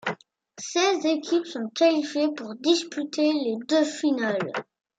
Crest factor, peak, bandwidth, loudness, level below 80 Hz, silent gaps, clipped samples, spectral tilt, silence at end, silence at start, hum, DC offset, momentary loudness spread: 16 dB; -8 dBFS; 9.2 kHz; -25 LUFS; -82 dBFS; none; under 0.1%; -3.5 dB/octave; 0.35 s; 0.05 s; none; under 0.1%; 10 LU